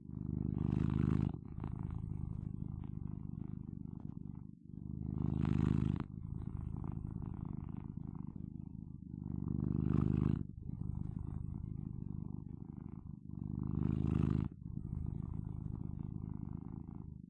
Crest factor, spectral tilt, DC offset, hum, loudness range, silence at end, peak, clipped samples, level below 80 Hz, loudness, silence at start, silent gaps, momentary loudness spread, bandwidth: 20 dB; -11 dB/octave; under 0.1%; none; 6 LU; 0.05 s; -20 dBFS; under 0.1%; -50 dBFS; -41 LUFS; 0 s; none; 13 LU; 4.3 kHz